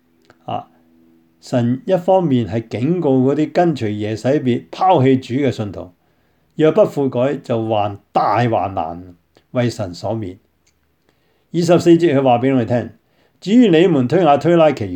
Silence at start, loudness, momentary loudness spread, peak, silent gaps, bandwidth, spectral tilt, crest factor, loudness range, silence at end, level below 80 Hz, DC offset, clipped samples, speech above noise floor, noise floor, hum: 0.5 s; -16 LUFS; 15 LU; 0 dBFS; none; 9.4 kHz; -7.5 dB/octave; 16 dB; 6 LU; 0 s; -58 dBFS; under 0.1%; under 0.1%; 46 dB; -61 dBFS; none